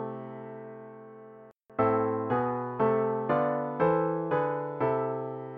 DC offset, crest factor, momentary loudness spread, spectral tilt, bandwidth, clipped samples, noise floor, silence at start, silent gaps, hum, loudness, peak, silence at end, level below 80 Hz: under 0.1%; 16 dB; 18 LU; -10.5 dB/octave; 4.6 kHz; under 0.1%; -52 dBFS; 0 s; none; none; -29 LUFS; -14 dBFS; 0 s; -66 dBFS